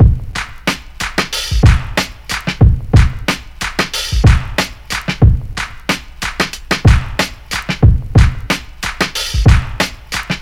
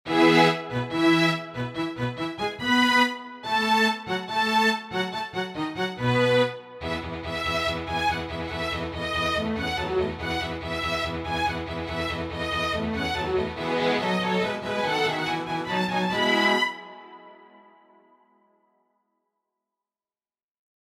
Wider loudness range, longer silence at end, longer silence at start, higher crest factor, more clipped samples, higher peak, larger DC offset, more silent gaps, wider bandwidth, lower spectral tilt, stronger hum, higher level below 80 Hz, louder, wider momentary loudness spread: about the same, 2 LU vs 4 LU; second, 0 s vs 3.6 s; about the same, 0 s vs 0.05 s; second, 14 dB vs 20 dB; first, 1% vs under 0.1%; first, 0 dBFS vs -6 dBFS; neither; neither; about the same, 16.5 kHz vs 16 kHz; about the same, -5 dB/octave vs -5 dB/octave; neither; first, -18 dBFS vs -48 dBFS; first, -15 LUFS vs -25 LUFS; about the same, 9 LU vs 10 LU